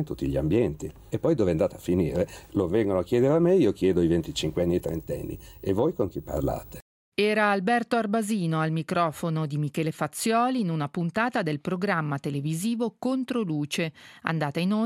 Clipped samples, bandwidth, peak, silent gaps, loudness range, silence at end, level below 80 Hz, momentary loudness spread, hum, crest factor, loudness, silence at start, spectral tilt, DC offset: under 0.1%; 17 kHz; -6 dBFS; 6.82-7.12 s; 4 LU; 0 s; -50 dBFS; 8 LU; none; 20 dB; -26 LUFS; 0 s; -6 dB/octave; under 0.1%